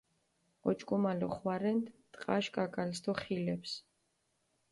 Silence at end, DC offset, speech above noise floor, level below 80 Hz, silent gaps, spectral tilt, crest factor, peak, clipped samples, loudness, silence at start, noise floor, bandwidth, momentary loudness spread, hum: 0.9 s; under 0.1%; 44 dB; -72 dBFS; none; -6 dB/octave; 20 dB; -18 dBFS; under 0.1%; -36 LUFS; 0.65 s; -79 dBFS; 11.5 kHz; 9 LU; none